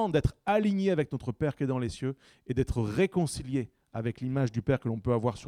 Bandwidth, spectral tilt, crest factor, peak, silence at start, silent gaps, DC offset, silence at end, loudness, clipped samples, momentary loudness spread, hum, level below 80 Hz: 13 kHz; -7 dB/octave; 16 dB; -12 dBFS; 0 s; none; under 0.1%; 0 s; -30 LUFS; under 0.1%; 8 LU; none; -46 dBFS